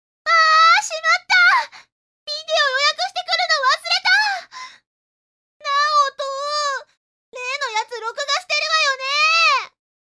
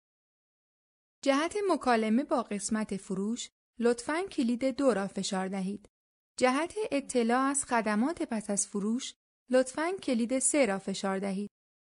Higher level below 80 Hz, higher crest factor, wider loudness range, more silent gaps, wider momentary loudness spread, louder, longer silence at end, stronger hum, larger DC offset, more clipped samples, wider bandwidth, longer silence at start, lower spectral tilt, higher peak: second, -80 dBFS vs -68 dBFS; about the same, 16 dB vs 20 dB; first, 6 LU vs 2 LU; first, 1.92-2.27 s, 4.87-5.60 s, 6.97-7.32 s vs 3.52-3.74 s, 5.89-6.35 s, 9.16-9.46 s; first, 15 LU vs 8 LU; first, -17 LUFS vs -30 LUFS; about the same, 0.4 s vs 0.5 s; neither; neither; neither; about the same, 11 kHz vs 11 kHz; second, 0.25 s vs 1.25 s; second, 4 dB/octave vs -4 dB/octave; first, -4 dBFS vs -12 dBFS